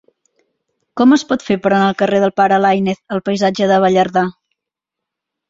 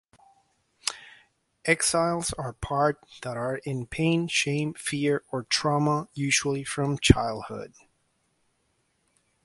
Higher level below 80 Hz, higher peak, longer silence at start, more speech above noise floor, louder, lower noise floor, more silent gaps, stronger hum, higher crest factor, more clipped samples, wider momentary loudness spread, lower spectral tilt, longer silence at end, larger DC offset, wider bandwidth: second, -56 dBFS vs -44 dBFS; about the same, -2 dBFS vs 0 dBFS; about the same, 0.95 s vs 0.85 s; first, 69 dB vs 46 dB; first, -14 LUFS vs -26 LUFS; first, -82 dBFS vs -72 dBFS; neither; neither; second, 14 dB vs 28 dB; neither; second, 7 LU vs 13 LU; first, -6 dB/octave vs -4 dB/octave; second, 1.2 s vs 1.8 s; neither; second, 7.8 kHz vs 11.5 kHz